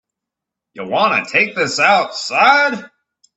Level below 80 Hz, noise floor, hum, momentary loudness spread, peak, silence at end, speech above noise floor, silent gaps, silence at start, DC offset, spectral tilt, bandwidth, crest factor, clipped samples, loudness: -66 dBFS; -83 dBFS; none; 10 LU; 0 dBFS; 0.5 s; 68 dB; none; 0.75 s; under 0.1%; -2.5 dB/octave; 8.4 kHz; 16 dB; under 0.1%; -14 LUFS